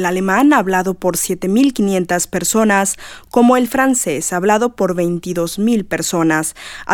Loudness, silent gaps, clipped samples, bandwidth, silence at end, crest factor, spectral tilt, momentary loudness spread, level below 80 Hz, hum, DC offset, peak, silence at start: -15 LUFS; none; under 0.1%; 19 kHz; 0 s; 14 dB; -4.5 dB/octave; 7 LU; -46 dBFS; none; under 0.1%; 0 dBFS; 0 s